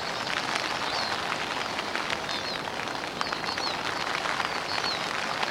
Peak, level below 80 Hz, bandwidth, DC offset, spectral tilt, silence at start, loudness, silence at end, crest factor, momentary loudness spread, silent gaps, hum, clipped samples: -6 dBFS; -60 dBFS; 17 kHz; under 0.1%; -2 dB/octave; 0 s; -29 LUFS; 0 s; 24 dB; 3 LU; none; none; under 0.1%